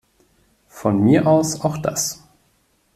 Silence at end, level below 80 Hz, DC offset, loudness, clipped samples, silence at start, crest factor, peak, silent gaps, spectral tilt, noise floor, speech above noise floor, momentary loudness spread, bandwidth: 0.8 s; -54 dBFS; under 0.1%; -18 LUFS; under 0.1%; 0.75 s; 18 dB; -2 dBFS; none; -5.5 dB/octave; -62 dBFS; 45 dB; 10 LU; 16 kHz